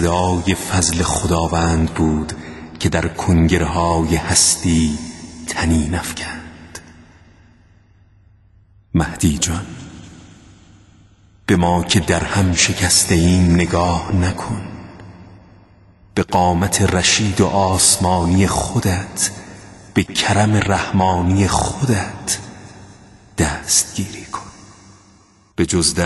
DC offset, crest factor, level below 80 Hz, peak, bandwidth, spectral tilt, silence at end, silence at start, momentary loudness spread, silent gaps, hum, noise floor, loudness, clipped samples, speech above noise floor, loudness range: under 0.1%; 18 dB; -32 dBFS; 0 dBFS; 12.5 kHz; -4 dB/octave; 0 s; 0 s; 17 LU; none; none; -51 dBFS; -16 LUFS; under 0.1%; 34 dB; 9 LU